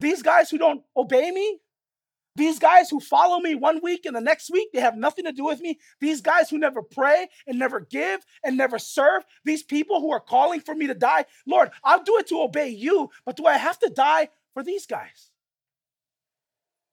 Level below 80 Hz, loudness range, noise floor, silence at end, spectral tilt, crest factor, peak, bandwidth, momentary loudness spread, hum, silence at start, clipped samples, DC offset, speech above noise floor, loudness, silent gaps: -84 dBFS; 3 LU; under -90 dBFS; 1.9 s; -3.5 dB/octave; 20 dB; -2 dBFS; 17 kHz; 10 LU; none; 0 s; under 0.1%; under 0.1%; over 68 dB; -22 LUFS; none